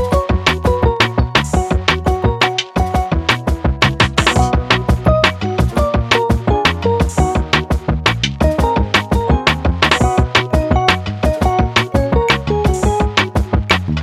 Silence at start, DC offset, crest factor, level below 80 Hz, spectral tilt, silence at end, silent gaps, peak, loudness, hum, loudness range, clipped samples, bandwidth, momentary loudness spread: 0 s; under 0.1%; 14 dB; -20 dBFS; -5 dB/octave; 0 s; none; 0 dBFS; -15 LUFS; none; 1 LU; under 0.1%; 14 kHz; 3 LU